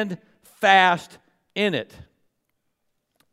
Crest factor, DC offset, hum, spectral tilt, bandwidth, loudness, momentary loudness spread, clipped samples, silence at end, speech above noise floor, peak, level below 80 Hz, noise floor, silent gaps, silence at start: 22 dB; under 0.1%; none; -4 dB/octave; 14.5 kHz; -20 LUFS; 20 LU; under 0.1%; 1.5 s; 53 dB; -2 dBFS; -66 dBFS; -75 dBFS; none; 0 s